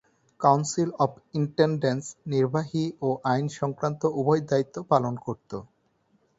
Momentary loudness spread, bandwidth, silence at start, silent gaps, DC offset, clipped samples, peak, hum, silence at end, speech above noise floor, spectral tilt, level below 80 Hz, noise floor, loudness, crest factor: 9 LU; 8 kHz; 0.4 s; none; under 0.1%; under 0.1%; -6 dBFS; none; 0.75 s; 42 dB; -6.5 dB/octave; -64 dBFS; -68 dBFS; -26 LUFS; 20 dB